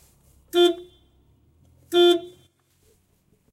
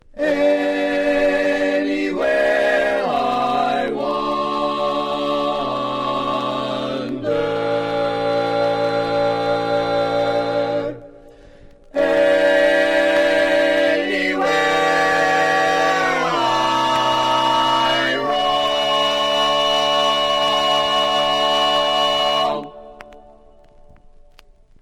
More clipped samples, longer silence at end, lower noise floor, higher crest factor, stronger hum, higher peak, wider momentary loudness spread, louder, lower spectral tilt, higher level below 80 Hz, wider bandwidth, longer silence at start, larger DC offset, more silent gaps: neither; second, 1.25 s vs 1.65 s; first, -64 dBFS vs -48 dBFS; first, 18 dB vs 12 dB; neither; about the same, -8 dBFS vs -6 dBFS; about the same, 8 LU vs 6 LU; about the same, -20 LUFS vs -18 LUFS; about the same, -3.5 dB/octave vs -3.5 dB/octave; second, -64 dBFS vs -48 dBFS; about the same, 15.5 kHz vs 15.5 kHz; first, 0.55 s vs 0.15 s; neither; neither